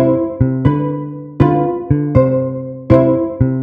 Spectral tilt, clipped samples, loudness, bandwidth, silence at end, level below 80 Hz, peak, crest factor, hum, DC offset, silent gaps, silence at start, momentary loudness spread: -11.5 dB/octave; 0.2%; -15 LUFS; 5 kHz; 0 s; -34 dBFS; 0 dBFS; 14 dB; none; under 0.1%; none; 0 s; 10 LU